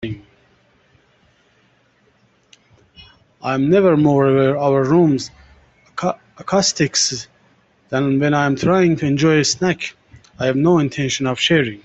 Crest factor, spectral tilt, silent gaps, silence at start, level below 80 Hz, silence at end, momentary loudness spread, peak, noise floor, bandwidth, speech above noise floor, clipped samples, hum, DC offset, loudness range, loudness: 16 dB; -5 dB/octave; none; 0 s; -52 dBFS; 0.05 s; 15 LU; -2 dBFS; -58 dBFS; 8.4 kHz; 42 dB; under 0.1%; none; under 0.1%; 4 LU; -16 LUFS